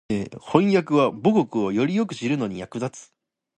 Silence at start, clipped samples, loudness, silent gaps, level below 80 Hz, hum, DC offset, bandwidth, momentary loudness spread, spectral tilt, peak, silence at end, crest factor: 0.1 s; under 0.1%; -23 LUFS; none; -58 dBFS; none; under 0.1%; 9.4 kHz; 11 LU; -7 dB/octave; -2 dBFS; 0.55 s; 20 dB